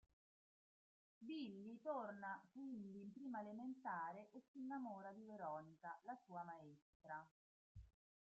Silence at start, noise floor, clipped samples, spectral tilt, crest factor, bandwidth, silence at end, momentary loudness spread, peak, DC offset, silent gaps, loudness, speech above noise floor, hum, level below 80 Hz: 1.2 s; under -90 dBFS; under 0.1%; -5 dB/octave; 18 dB; 7.6 kHz; 0.5 s; 12 LU; -36 dBFS; under 0.1%; 4.48-4.54 s, 6.82-7.00 s, 7.31-7.75 s; -54 LUFS; over 37 dB; none; -82 dBFS